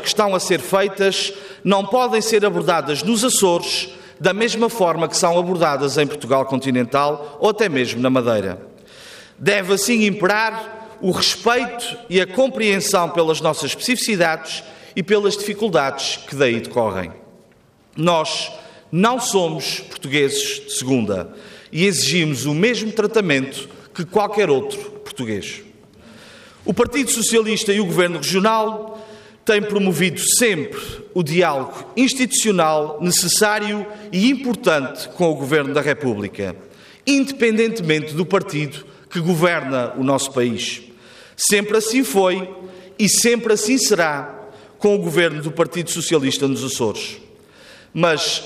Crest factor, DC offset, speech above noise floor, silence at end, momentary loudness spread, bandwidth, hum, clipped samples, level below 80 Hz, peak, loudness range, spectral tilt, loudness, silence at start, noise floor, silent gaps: 14 dB; under 0.1%; 34 dB; 0 s; 13 LU; 15.5 kHz; none; under 0.1%; -58 dBFS; -4 dBFS; 3 LU; -3.5 dB/octave; -18 LUFS; 0 s; -53 dBFS; none